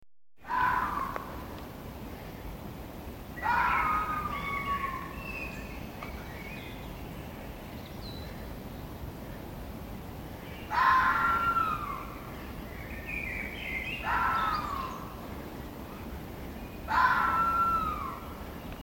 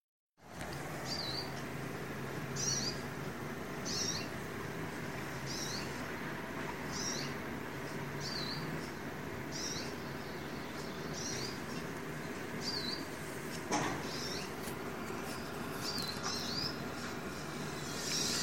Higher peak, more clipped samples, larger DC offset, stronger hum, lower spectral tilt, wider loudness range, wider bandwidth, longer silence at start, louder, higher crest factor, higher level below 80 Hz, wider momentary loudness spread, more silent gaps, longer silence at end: first, -12 dBFS vs -20 dBFS; neither; second, under 0.1% vs 0.2%; neither; first, -5 dB/octave vs -3 dB/octave; first, 12 LU vs 2 LU; about the same, 17 kHz vs 16.5 kHz; about the same, 0 s vs 0 s; first, -32 LUFS vs -39 LUFS; about the same, 20 dB vs 20 dB; first, -46 dBFS vs -62 dBFS; first, 17 LU vs 7 LU; second, none vs 0.00-0.30 s; about the same, 0 s vs 0 s